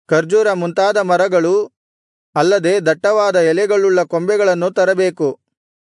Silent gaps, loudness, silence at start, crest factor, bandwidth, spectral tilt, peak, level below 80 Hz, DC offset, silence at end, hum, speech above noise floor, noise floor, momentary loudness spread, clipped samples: 1.77-2.33 s; -15 LUFS; 0.1 s; 12 dB; 11 kHz; -5 dB/octave; -2 dBFS; -70 dBFS; under 0.1%; 0.65 s; none; over 76 dB; under -90 dBFS; 4 LU; under 0.1%